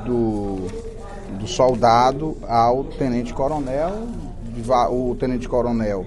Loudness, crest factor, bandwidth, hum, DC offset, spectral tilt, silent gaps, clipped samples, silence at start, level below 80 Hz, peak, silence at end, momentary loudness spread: -21 LUFS; 18 dB; 11.5 kHz; none; under 0.1%; -6.5 dB/octave; none; under 0.1%; 0 s; -34 dBFS; -2 dBFS; 0 s; 16 LU